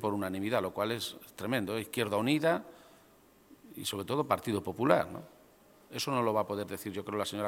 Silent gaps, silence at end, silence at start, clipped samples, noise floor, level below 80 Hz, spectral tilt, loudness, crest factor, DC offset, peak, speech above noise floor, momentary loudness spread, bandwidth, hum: none; 0 s; 0 s; under 0.1%; -62 dBFS; -70 dBFS; -5 dB/octave; -33 LUFS; 26 dB; under 0.1%; -8 dBFS; 29 dB; 11 LU; 17 kHz; none